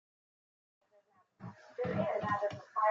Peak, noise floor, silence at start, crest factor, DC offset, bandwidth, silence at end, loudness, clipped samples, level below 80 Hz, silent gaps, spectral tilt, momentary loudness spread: -20 dBFS; -70 dBFS; 1.4 s; 18 dB; under 0.1%; 7.6 kHz; 0 s; -36 LUFS; under 0.1%; -74 dBFS; none; -7.5 dB/octave; 18 LU